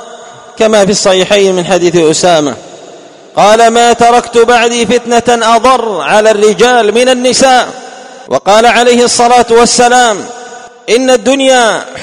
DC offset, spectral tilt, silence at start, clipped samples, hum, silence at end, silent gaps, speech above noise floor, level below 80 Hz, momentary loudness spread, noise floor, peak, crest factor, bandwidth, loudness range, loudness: under 0.1%; -3 dB/octave; 0 s; 3%; none; 0 s; none; 26 dB; -40 dBFS; 7 LU; -32 dBFS; 0 dBFS; 8 dB; 14.5 kHz; 1 LU; -7 LUFS